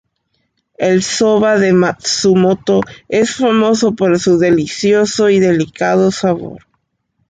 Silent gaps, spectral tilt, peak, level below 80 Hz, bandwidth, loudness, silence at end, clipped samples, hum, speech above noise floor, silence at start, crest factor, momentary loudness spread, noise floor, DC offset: none; -5 dB/octave; -2 dBFS; -50 dBFS; 9.4 kHz; -13 LUFS; 0.75 s; under 0.1%; none; 54 dB; 0.8 s; 12 dB; 5 LU; -66 dBFS; under 0.1%